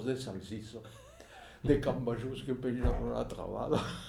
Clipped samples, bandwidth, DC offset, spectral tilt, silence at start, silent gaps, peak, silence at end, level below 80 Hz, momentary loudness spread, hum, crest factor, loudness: under 0.1%; 15 kHz; under 0.1%; -7 dB/octave; 0 s; none; -14 dBFS; 0 s; -44 dBFS; 21 LU; none; 20 dB; -35 LUFS